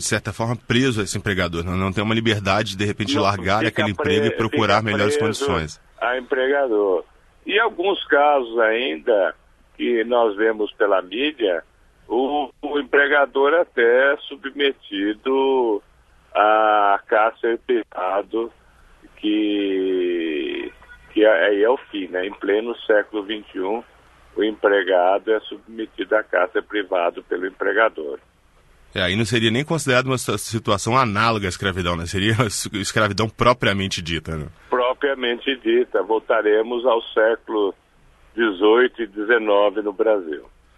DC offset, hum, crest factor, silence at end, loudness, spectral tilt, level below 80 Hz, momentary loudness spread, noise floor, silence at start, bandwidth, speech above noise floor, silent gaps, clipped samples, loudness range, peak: under 0.1%; none; 18 dB; 0.35 s; -20 LUFS; -4.5 dB/octave; -50 dBFS; 10 LU; -54 dBFS; 0 s; 12.5 kHz; 34 dB; none; under 0.1%; 3 LU; -2 dBFS